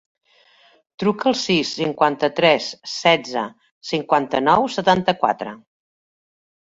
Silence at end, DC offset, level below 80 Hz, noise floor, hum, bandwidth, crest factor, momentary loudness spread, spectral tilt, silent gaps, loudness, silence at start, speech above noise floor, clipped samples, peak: 1.1 s; under 0.1%; -60 dBFS; -55 dBFS; none; 8 kHz; 20 dB; 10 LU; -4.5 dB/octave; 3.71-3.81 s; -19 LUFS; 1 s; 36 dB; under 0.1%; 0 dBFS